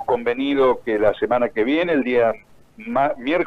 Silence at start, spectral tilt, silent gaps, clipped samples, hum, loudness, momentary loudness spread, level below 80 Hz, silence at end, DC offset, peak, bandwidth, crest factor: 0 s; -7 dB/octave; none; under 0.1%; none; -20 LUFS; 4 LU; -50 dBFS; 0 s; under 0.1%; -2 dBFS; 6.4 kHz; 18 dB